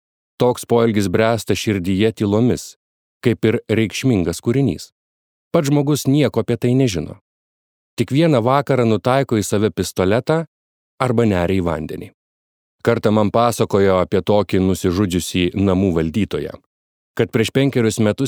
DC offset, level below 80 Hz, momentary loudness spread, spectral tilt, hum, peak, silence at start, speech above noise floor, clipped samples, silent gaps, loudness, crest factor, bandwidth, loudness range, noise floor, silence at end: under 0.1%; -46 dBFS; 7 LU; -6 dB/octave; none; -2 dBFS; 0.4 s; over 73 dB; under 0.1%; 2.76-3.21 s, 4.92-5.51 s, 7.21-7.97 s, 10.48-10.98 s, 12.14-12.79 s, 16.66-17.14 s; -18 LUFS; 16 dB; 20 kHz; 3 LU; under -90 dBFS; 0 s